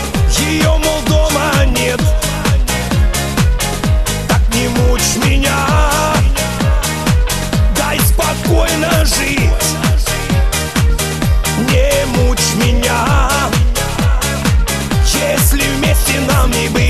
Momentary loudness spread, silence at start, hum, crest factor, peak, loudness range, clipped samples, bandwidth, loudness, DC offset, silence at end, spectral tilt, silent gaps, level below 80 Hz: 3 LU; 0 s; none; 12 dB; 0 dBFS; 1 LU; under 0.1%; 13.5 kHz; -13 LUFS; 0.2%; 0 s; -4 dB/octave; none; -16 dBFS